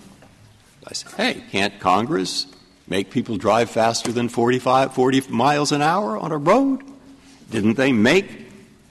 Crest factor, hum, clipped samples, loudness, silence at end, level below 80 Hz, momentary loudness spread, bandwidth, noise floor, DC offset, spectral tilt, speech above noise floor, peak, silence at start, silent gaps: 16 dB; none; under 0.1%; -20 LUFS; 0.35 s; -58 dBFS; 11 LU; 13 kHz; -50 dBFS; under 0.1%; -4.5 dB/octave; 31 dB; -4 dBFS; 0.85 s; none